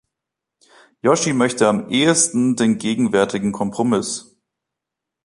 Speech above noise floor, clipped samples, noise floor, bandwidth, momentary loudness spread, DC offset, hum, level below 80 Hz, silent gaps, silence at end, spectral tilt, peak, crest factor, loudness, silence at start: 66 dB; under 0.1%; -84 dBFS; 11.5 kHz; 7 LU; under 0.1%; none; -58 dBFS; none; 1 s; -4 dB/octave; -2 dBFS; 18 dB; -18 LUFS; 1.05 s